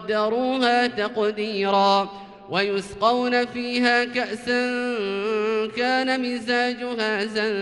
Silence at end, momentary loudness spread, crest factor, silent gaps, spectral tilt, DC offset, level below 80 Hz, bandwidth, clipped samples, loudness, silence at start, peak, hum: 0 s; 6 LU; 16 dB; none; -4.5 dB/octave; under 0.1%; -62 dBFS; 11.5 kHz; under 0.1%; -23 LUFS; 0 s; -8 dBFS; none